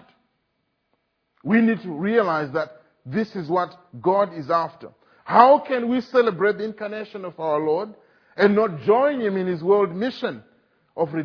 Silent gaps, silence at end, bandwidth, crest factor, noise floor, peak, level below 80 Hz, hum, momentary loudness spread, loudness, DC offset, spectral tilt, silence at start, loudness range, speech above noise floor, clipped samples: none; 0 s; 5.4 kHz; 22 dB; -73 dBFS; 0 dBFS; -70 dBFS; none; 13 LU; -21 LUFS; under 0.1%; -8 dB/octave; 1.45 s; 4 LU; 52 dB; under 0.1%